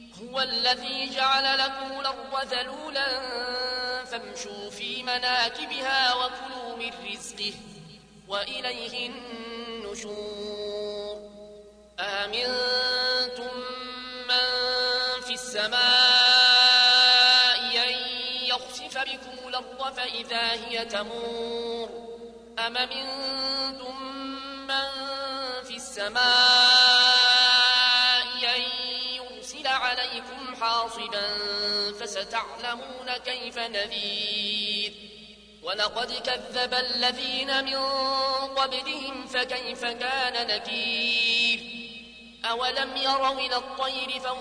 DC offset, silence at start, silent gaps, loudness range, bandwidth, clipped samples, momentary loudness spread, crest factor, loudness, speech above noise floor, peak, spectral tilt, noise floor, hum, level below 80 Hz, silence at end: under 0.1%; 0 s; none; 13 LU; 11 kHz; under 0.1%; 19 LU; 18 dB; -23 LUFS; 22 dB; -8 dBFS; -0.5 dB/octave; -49 dBFS; none; -62 dBFS; 0 s